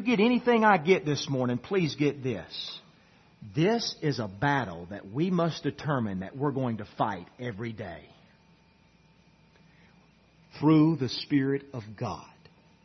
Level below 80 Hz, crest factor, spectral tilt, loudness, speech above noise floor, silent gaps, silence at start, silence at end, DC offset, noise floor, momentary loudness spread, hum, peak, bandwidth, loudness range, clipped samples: -66 dBFS; 20 dB; -6.5 dB/octave; -28 LUFS; 34 dB; none; 0 s; 0.6 s; under 0.1%; -61 dBFS; 15 LU; none; -8 dBFS; 6.4 kHz; 10 LU; under 0.1%